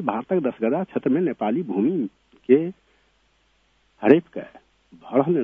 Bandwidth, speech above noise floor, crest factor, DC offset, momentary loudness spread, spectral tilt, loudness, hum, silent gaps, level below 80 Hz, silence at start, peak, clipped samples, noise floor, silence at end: 3.8 kHz; 43 dB; 24 dB; under 0.1%; 16 LU; -10 dB/octave; -22 LUFS; none; none; -68 dBFS; 0 s; 0 dBFS; under 0.1%; -64 dBFS; 0 s